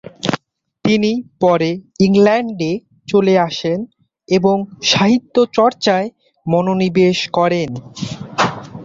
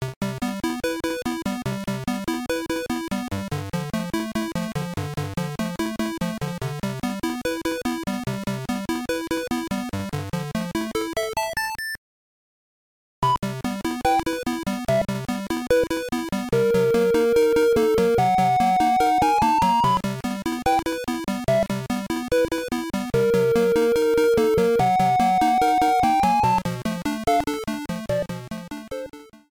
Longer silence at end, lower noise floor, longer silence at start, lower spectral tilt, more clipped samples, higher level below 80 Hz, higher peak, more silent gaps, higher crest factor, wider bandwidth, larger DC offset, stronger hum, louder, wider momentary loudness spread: second, 0 s vs 0.15 s; second, -47 dBFS vs under -90 dBFS; first, 0.25 s vs 0 s; about the same, -5.5 dB/octave vs -5.5 dB/octave; neither; second, -54 dBFS vs -46 dBFS; first, 0 dBFS vs -6 dBFS; second, none vs 0.16-0.21 s, 11.98-13.22 s; about the same, 16 dB vs 16 dB; second, 7.8 kHz vs 20 kHz; neither; neither; first, -16 LUFS vs -23 LUFS; about the same, 12 LU vs 10 LU